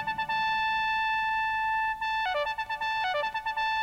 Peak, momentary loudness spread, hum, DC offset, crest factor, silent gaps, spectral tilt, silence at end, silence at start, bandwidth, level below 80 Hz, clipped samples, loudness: -18 dBFS; 3 LU; none; under 0.1%; 10 dB; none; -2 dB/octave; 0 s; 0 s; 16 kHz; -56 dBFS; under 0.1%; -28 LUFS